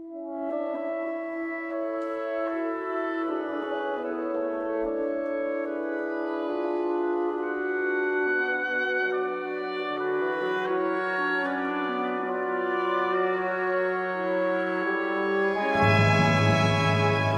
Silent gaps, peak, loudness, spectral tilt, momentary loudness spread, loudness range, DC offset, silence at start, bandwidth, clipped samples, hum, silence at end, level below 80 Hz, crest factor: none; -10 dBFS; -27 LUFS; -6.5 dB/octave; 8 LU; 6 LU; under 0.1%; 0 s; 10.5 kHz; under 0.1%; none; 0 s; -60 dBFS; 18 dB